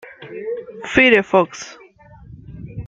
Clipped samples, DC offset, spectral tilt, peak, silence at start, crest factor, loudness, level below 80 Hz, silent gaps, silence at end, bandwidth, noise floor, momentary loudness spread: under 0.1%; under 0.1%; -4.5 dB/octave; 0 dBFS; 0.05 s; 20 dB; -16 LUFS; -46 dBFS; none; 0 s; 7.8 kHz; -44 dBFS; 23 LU